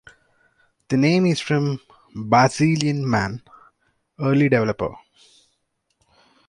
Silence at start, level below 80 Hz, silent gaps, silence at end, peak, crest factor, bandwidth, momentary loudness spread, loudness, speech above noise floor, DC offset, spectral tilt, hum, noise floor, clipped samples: 0.9 s; -54 dBFS; none; 1.5 s; -2 dBFS; 20 dB; 11.5 kHz; 13 LU; -20 LUFS; 53 dB; under 0.1%; -6 dB/octave; none; -72 dBFS; under 0.1%